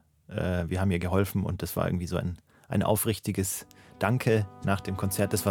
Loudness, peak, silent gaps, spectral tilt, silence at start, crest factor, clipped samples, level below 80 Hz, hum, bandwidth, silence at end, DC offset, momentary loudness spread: -29 LUFS; -8 dBFS; none; -5.5 dB/octave; 0.3 s; 20 dB; under 0.1%; -54 dBFS; none; 19 kHz; 0 s; under 0.1%; 7 LU